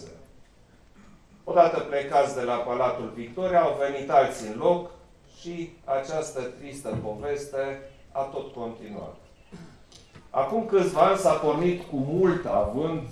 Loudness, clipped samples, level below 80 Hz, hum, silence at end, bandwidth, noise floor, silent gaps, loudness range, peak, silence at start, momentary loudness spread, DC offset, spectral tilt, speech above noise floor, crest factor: -26 LUFS; under 0.1%; -54 dBFS; none; 0 s; 13.5 kHz; -56 dBFS; none; 10 LU; -4 dBFS; 0 s; 16 LU; under 0.1%; -6 dB/octave; 30 dB; 22 dB